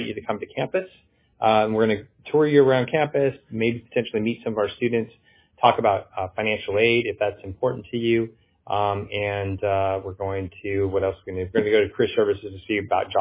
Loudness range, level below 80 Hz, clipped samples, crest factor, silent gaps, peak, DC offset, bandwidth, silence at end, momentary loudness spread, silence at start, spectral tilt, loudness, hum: 4 LU; -50 dBFS; under 0.1%; 20 dB; none; -2 dBFS; under 0.1%; 3.9 kHz; 0 s; 10 LU; 0 s; -10 dB/octave; -23 LUFS; none